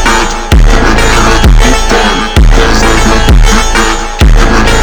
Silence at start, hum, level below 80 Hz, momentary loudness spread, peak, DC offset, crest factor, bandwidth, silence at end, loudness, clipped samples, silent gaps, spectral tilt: 0 s; none; -6 dBFS; 3 LU; 0 dBFS; under 0.1%; 4 dB; 19.5 kHz; 0 s; -7 LUFS; 6%; none; -4 dB/octave